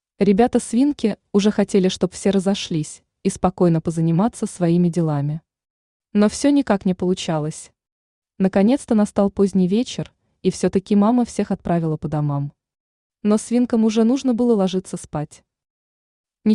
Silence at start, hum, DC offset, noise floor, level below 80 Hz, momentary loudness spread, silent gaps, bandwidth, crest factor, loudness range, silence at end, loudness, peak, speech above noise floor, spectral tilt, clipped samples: 0.2 s; none; under 0.1%; under -90 dBFS; -52 dBFS; 10 LU; 5.70-6.00 s, 7.92-8.22 s, 12.80-13.10 s, 15.70-16.24 s; 11 kHz; 16 dB; 2 LU; 0 s; -20 LUFS; -4 dBFS; over 71 dB; -6.5 dB/octave; under 0.1%